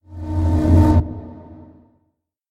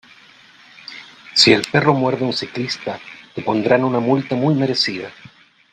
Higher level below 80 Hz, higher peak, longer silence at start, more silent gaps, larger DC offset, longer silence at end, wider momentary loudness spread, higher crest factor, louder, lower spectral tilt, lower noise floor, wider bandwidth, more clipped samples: first, -28 dBFS vs -60 dBFS; about the same, -2 dBFS vs 0 dBFS; second, 0.1 s vs 0.9 s; neither; neither; first, 0.95 s vs 0.45 s; about the same, 20 LU vs 22 LU; about the same, 16 dB vs 20 dB; about the same, -17 LUFS vs -17 LUFS; first, -9.5 dB/octave vs -5 dB/octave; first, -70 dBFS vs -47 dBFS; second, 5.6 kHz vs 9.6 kHz; neither